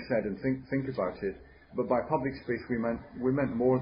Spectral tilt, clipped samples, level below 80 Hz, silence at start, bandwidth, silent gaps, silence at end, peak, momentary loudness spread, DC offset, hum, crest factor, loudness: -11.5 dB/octave; under 0.1%; -56 dBFS; 0 s; 5.4 kHz; none; 0 s; -12 dBFS; 8 LU; under 0.1%; none; 18 dB; -32 LUFS